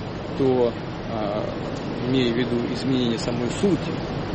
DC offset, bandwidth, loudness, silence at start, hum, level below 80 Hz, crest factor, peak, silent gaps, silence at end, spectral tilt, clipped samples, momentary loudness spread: under 0.1%; 8.8 kHz; -24 LUFS; 0 s; none; -44 dBFS; 14 dB; -10 dBFS; none; 0 s; -6.5 dB/octave; under 0.1%; 8 LU